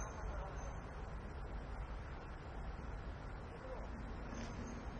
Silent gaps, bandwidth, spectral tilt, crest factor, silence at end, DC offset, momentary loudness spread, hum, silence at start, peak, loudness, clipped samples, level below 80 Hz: none; 8.8 kHz; -6 dB/octave; 14 dB; 0 s; under 0.1%; 3 LU; none; 0 s; -34 dBFS; -49 LUFS; under 0.1%; -48 dBFS